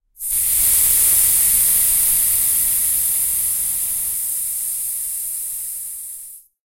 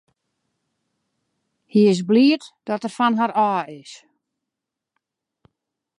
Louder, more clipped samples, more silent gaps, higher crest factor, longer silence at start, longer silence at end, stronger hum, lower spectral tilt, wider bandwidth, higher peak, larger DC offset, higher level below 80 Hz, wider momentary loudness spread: first, -15 LUFS vs -19 LUFS; neither; neither; about the same, 16 dB vs 18 dB; second, 0.2 s vs 1.75 s; second, 0.3 s vs 2.05 s; neither; second, 1.5 dB/octave vs -6 dB/octave; first, 16.5 kHz vs 11 kHz; first, -2 dBFS vs -6 dBFS; neither; first, -44 dBFS vs -76 dBFS; about the same, 13 LU vs 12 LU